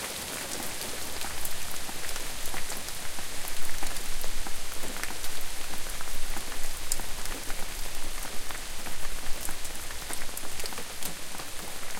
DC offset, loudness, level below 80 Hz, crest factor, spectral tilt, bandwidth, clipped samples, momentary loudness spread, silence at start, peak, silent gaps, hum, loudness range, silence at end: under 0.1%; -35 LUFS; -36 dBFS; 22 dB; -1.5 dB/octave; 17 kHz; under 0.1%; 3 LU; 0 s; -4 dBFS; none; none; 2 LU; 0 s